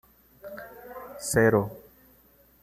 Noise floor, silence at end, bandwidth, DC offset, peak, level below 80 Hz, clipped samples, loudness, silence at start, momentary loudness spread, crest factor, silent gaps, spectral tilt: -59 dBFS; 0.85 s; 15 kHz; under 0.1%; -8 dBFS; -56 dBFS; under 0.1%; -25 LUFS; 0.45 s; 24 LU; 22 dB; none; -5.5 dB/octave